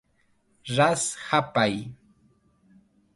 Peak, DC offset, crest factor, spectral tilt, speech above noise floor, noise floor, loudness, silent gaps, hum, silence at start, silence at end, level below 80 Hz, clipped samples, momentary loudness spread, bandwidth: -6 dBFS; under 0.1%; 22 dB; -4 dB/octave; 42 dB; -67 dBFS; -24 LUFS; none; none; 0.65 s; 1.2 s; -64 dBFS; under 0.1%; 17 LU; 11.5 kHz